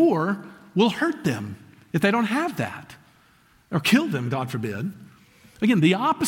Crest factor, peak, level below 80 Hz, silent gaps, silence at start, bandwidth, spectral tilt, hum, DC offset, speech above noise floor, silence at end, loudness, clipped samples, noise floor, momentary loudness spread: 18 dB; -6 dBFS; -64 dBFS; none; 0 s; 17 kHz; -6 dB/octave; none; under 0.1%; 35 dB; 0 s; -24 LUFS; under 0.1%; -58 dBFS; 12 LU